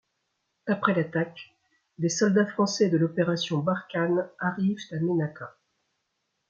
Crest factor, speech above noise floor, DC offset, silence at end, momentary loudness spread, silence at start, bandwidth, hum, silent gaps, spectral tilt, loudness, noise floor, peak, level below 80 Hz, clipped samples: 20 dB; 52 dB; under 0.1%; 1 s; 11 LU; 0.65 s; 7.6 kHz; none; none; -5.5 dB/octave; -26 LUFS; -78 dBFS; -8 dBFS; -72 dBFS; under 0.1%